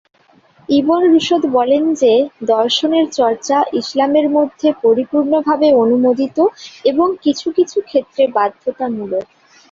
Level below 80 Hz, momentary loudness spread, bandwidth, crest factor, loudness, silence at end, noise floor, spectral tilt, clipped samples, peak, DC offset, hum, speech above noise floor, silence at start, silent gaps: -60 dBFS; 7 LU; 7.6 kHz; 12 dB; -15 LUFS; 0.5 s; -51 dBFS; -4.5 dB/octave; under 0.1%; -2 dBFS; under 0.1%; none; 37 dB; 0.7 s; none